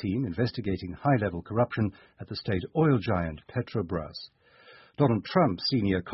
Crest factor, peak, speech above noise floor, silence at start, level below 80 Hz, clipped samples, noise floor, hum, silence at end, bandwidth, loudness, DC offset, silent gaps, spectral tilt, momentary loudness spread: 20 dB; -8 dBFS; 27 dB; 0 s; -48 dBFS; under 0.1%; -55 dBFS; none; 0 s; 5.8 kHz; -28 LUFS; under 0.1%; none; -10.5 dB/octave; 13 LU